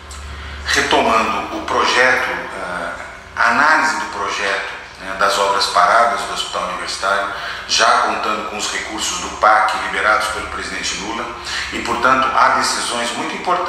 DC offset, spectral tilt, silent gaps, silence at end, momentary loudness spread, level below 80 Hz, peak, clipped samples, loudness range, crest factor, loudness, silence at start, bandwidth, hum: under 0.1%; -1.5 dB/octave; none; 0 s; 12 LU; -42 dBFS; 0 dBFS; under 0.1%; 2 LU; 18 dB; -16 LUFS; 0 s; 15.5 kHz; none